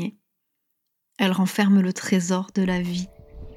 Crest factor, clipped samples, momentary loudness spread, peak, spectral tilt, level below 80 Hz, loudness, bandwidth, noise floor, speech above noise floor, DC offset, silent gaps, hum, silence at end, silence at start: 20 dB; under 0.1%; 12 LU; -4 dBFS; -5.5 dB/octave; -50 dBFS; -22 LUFS; 14.5 kHz; -77 dBFS; 55 dB; under 0.1%; none; none; 0 s; 0 s